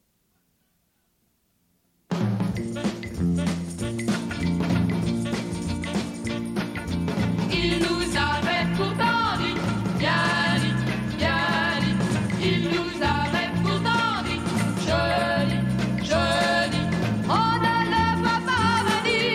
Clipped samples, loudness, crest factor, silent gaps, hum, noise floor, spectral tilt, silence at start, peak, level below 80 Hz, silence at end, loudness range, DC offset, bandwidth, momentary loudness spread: under 0.1%; -24 LUFS; 14 dB; none; none; -69 dBFS; -5.5 dB/octave; 2.1 s; -10 dBFS; -44 dBFS; 0 s; 5 LU; under 0.1%; 14.5 kHz; 7 LU